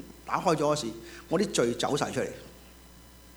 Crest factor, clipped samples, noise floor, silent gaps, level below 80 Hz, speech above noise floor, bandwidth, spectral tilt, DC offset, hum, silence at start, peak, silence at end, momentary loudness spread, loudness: 20 dB; under 0.1%; -52 dBFS; none; -56 dBFS; 23 dB; over 20 kHz; -4.5 dB/octave; under 0.1%; none; 0 s; -10 dBFS; 0 s; 15 LU; -29 LUFS